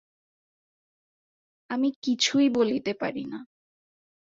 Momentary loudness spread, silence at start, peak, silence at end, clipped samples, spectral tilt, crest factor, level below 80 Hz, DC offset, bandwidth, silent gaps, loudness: 14 LU; 1.7 s; -10 dBFS; 0.9 s; under 0.1%; -3.5 dB/octave; 18 dB; -72 dBFS; under 0.1%; 7.8 kHz; 1.96-2.02 s; -26 LUFS